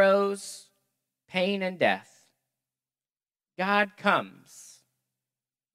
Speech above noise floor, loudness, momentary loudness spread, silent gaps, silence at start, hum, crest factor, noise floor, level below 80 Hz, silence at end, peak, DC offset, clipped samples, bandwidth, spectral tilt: over 62 dB; -27 LUFS; 21 LU; none; 0 s; none; 24 dB; under -90 dBFS; -86 dBFS; 1.15 s; -6 dBFS; under 0.1%; under 0.1%; 15 kHz; -4.5 dB/octave